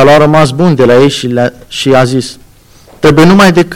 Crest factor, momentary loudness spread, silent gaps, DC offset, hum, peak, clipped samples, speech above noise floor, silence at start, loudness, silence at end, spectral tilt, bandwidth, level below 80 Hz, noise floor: 6 dB; 10 LU; none; under 0.1%; none; 0 dBFS; under 0.1%; 32 dB; 0 s; -7 LUFS; 0 s; -6 dB/octave; 17.5 kHz; -34 dBFS; -38 dBFS